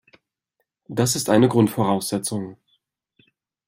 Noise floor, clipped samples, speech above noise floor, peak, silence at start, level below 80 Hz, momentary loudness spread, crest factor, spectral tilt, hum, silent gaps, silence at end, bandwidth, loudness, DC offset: -77 dBFS; under 0.1%; 57 dB; -4 dBFS; 0.9 s; -60 dBFS; 13 LU; 20 dB; -5 dB/octave; none; none; 1.15 s; 16 kHz; -21 LUFS; under 0.1%